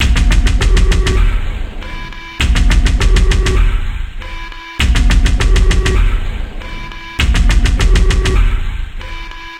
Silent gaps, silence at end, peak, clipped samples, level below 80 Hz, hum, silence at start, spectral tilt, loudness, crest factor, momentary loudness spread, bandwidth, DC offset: none; 0 s; 0 dBFS; under 0.1%; -12 dBFS; none; 0 s; -4.5 dB/octave; -14 LUFS; 12 dB; 14 LU; 11 kHz; under 0.1%